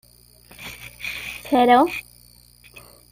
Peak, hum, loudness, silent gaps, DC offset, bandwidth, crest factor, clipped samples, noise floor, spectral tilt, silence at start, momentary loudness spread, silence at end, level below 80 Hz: -2 dBFS; 60 Hz at -45 dBFS; -20 LUFS; none; under 0.1%; 16 kHz; 20 dB; under 0.1%; -51 dBFS; -4 dB/octave; 0.6 s; 21 LU; 1.1 s; -54 dBFS